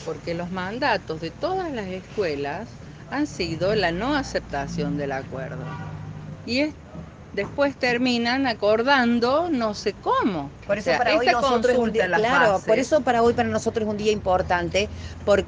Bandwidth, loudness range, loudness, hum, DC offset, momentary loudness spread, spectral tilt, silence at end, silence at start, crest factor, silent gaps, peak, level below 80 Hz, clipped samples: 9.8 kHz; 7 LU; -23 LUFS; none; under 0.1%; 14 LU; -5 dB/octave; 0 s; 0 s; 18 dB; none; -6 dBFS; -46 dBFS; under 0.1%